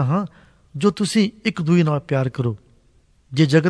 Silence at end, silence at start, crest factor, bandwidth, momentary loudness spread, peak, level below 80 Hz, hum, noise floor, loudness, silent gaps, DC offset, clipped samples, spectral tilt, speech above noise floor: 0 s; 0 s; 16 dB; 11 kHz; 12 LU; -4 dBFS; -56 dBFS; none; -57 dBFS; -20 LUFS; none; under 0.1%; under 0.1%; -6.5 dB/octave; 38 dB